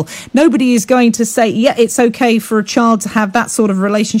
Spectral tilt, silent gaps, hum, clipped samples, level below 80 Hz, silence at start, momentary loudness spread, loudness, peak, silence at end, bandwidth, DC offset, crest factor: -4.5 dB/octave; none; none; under 0.1%; -54 dBFS; 0 s; 4 LU; -12 LUFS; 0 dBFS; 0 s; 16.5 kHz; under 0.1%; 12 dB